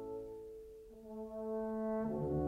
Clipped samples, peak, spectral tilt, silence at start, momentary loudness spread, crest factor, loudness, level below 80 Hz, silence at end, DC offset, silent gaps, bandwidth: under 0.1%; -26 dBFS; -10 dB/octave; 0 s; 15 LU; 14 dB; -42 LUFS; -58 dBFS; 0 s; under 0.1%; none; 15 kHz